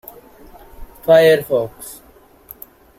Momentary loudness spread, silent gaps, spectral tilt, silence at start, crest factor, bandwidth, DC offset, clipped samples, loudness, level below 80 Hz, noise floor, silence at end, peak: 26 LU; none; -5 dB/octave; 0.8 s; 18 dB; 16.5 kHz; under 0.1%; under 0.1%; -15 LUFS; -46 dBFS; -48 dBFS; 1.05 s; -2 dBFS